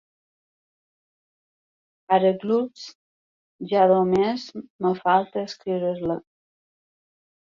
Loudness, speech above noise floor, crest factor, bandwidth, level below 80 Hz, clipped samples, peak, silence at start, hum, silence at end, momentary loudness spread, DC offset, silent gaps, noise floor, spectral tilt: -23 LUFS; over 68 dB; 20 dB; 7.4 kHz; -64 dBFS; under 0.1%; -6 dBFS; 2.1 s; none; 1.4 s; 15 LU; under 0.1%; 2.95-3.59 s, 4.70-4.79 s; under -90 dBFS; -7 dB/octave